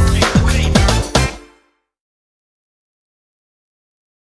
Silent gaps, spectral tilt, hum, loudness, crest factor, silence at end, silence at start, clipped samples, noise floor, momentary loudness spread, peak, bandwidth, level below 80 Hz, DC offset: none; -4.5 dB/octave; none; -14 LUFS; 18 dB; 2.9 s; 0 s; under 0.1%; -57 dBFS; 4 LU; 0 dBFS; 11 kHz; -22 dBFS; under 0.1%